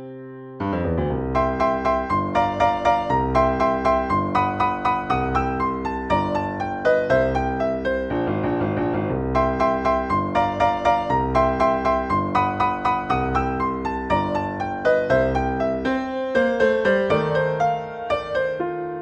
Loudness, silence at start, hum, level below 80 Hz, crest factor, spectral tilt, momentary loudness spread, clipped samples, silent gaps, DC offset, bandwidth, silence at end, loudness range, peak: -22 LUFS; 0 s; none; -38 dBFS; 16 dB; -7.5 dB/octave; 6 LU; under 0.1%; none; under 0.1%; 9.2 kHz; 0 s; 2 LU; -6 dBFS